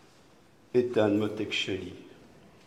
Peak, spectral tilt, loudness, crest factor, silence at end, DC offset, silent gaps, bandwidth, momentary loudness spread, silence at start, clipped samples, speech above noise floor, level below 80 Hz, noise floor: -10 dBFS; -5.5 dB/octave; -29 LUFS; 20 dB; 0.55 s; under 0.1%; none; 12.5 kHz; 15 LU; 0.75 s; under 0.1%; 31 dB; -70 dBFS; -59 dBFS